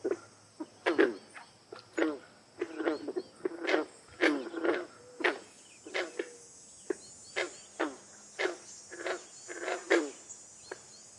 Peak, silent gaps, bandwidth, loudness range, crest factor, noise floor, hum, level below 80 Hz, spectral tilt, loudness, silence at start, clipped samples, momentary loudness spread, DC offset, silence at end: -10 dBFS; none; 11.5 kHz; 5 LU; 26 dB; -54 dBFS; none; -82 dBFS; -2.5 dB/octave; -35 LUFS; 0.05 s; under 0.1%; 19 LU; under 0.1%; 0 s